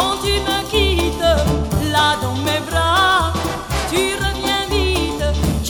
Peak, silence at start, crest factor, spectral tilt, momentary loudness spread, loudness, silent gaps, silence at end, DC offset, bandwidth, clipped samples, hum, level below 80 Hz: -4 dBFS; 0 s; 14 dB; -4 dB/octave; 5 LU; -17 LUFS; none; 0 s; under 0.1%; over 20 kHz; under 0.1%; none; -26 dBFS